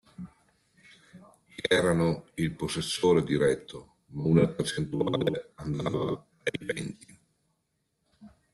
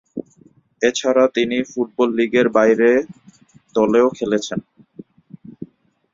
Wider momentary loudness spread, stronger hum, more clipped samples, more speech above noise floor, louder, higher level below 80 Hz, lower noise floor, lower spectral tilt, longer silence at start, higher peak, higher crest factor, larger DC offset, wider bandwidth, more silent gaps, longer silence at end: about the same, 21 LU vs 20 LU; neither; neither; first, 50 dB vs 36 dB; second, -28 LUFS vs -17 LUFS; about the same, -58 dBFS vs -60 dBFS; first, -77 dBFS vs -53 dBFS; about the same, -5.5 dB/octave vs -4.5 dB/octave; about the same, 0.2 s vs 0.15 s; second, -10 dBFS vs -2 dBFS; about the same, 20 dB vs 16 dB; neither; first, 12.5 kHz vs 7.6 kHz; neither; second, 0.25 s vs 0.5 s